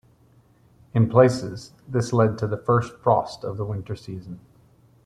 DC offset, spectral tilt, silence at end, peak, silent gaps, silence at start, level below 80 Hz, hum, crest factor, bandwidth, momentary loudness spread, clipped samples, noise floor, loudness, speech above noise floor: under 0.1%; -7.5 dB/octave; 0.65 s; -2 dBFS; none; 0.95 s; -56 dBFS; none; 22 dB; 10.5 kHz; 19 LU; under 0.1%; -57 dBFS; -23 LUFS; 35 dB